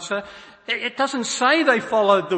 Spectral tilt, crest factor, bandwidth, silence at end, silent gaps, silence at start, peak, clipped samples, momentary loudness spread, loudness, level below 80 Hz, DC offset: -3 dB/octave; 18 dB; 8.8 kHz; 0 s; none; 0 s; -4 dBFS; under 0.1%; 12 LU; -20 LUFS; -66 dBFS; under 0.1%